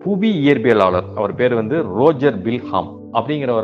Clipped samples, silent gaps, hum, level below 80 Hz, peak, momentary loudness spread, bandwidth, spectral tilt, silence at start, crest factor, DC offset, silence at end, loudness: under 0.1%; none; none; -56 dBFS; 0 dBFS; 9 LU; 7 kHz; -8.5 dB/octave; 0 s; 16 dB; under 0.1%; 0 s; -17 LUFS